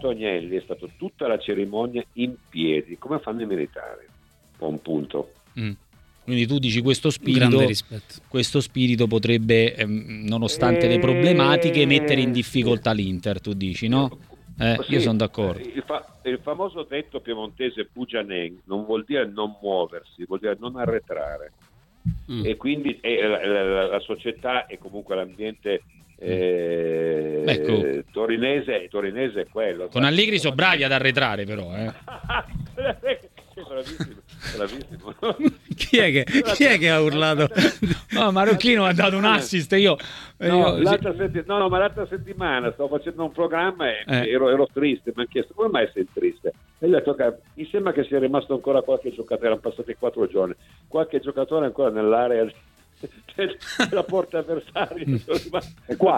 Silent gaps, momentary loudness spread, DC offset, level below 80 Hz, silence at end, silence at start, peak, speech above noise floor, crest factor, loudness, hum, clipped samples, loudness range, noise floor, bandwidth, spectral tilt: none; 14 LU; under 0.1%; -50 dBFS; 0 s; 0 s; -2 dBFS; 33 dB; 22 dB; -23 LUFS; none; under 0.1%; 9 LU; -55 dBFS; 17 kHz; -5.5 dB/octave